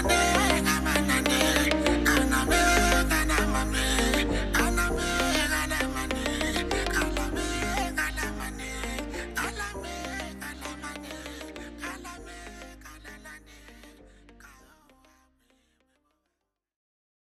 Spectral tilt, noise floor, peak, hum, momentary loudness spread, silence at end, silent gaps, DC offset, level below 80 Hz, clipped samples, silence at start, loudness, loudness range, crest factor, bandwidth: -3.5 dB/octave; -83 dBFS; -8 dBFS; none; 19 LU; 2.9 s; none; under 0.1%; -36 dBFS; under 0.1%; 0 s; -26 LUFS; 19 LU; 20 dB; 15.5 kHz